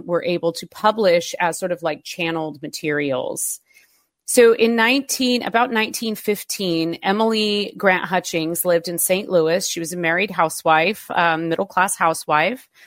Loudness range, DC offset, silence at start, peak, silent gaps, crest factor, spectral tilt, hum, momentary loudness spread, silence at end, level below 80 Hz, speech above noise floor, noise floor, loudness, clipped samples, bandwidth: 3 LU; under 0.1%; 0 s; -2 dBFS; none; 18 dB; -3 dB/octave; none; 8 LU; 0.25 s; -66 dBFS; 39 dB; -58 dBFS; -19 LUFS; under 0.1%; 16.5 kHz